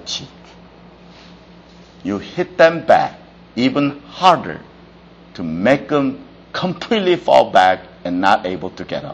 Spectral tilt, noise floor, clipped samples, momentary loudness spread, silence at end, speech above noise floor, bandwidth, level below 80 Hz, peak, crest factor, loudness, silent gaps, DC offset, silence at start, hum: -5.5 dB/octave; -43 dBFS; under 0.1%; 16 LU; 0 s; 27 dB; 9 kHz; -52 dBFS; 0 dBFS; 18 dB; -16 LUFS; none; under 0.1%; 0.05 s; none